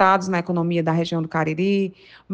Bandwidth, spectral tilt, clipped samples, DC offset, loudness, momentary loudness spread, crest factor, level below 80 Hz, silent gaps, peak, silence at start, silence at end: 8.2 kHz; -6.5 dB/octave; under 0.1%; under 0.1%; -22 LUFS; 4 LU; 18 dB; -62 dBFS; none; -4 dBFS; 0 s; 0 s